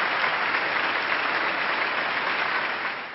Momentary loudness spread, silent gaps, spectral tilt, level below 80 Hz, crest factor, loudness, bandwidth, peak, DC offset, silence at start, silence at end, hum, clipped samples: 2 LU; none; -5.5 dB/octave; -66 dBFS; 18 dB; -24 LUFS; 6 kHz; -8 dBFS; under 0.1%; 0 s; 0 s; none; under 0.1%